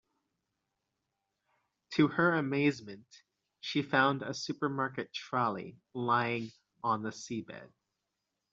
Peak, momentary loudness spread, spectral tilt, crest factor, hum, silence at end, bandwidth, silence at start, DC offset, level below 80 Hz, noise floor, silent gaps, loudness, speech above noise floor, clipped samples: -12 dBFS; 16 LU; -4 dB/octave; 22 dB; none; 0.85 s; 7.8 kHz; 1.9 s; under 0.1%; -76 dBFS; -86 dBFS; none; -32 LUFS; 53 dB; under 0.1%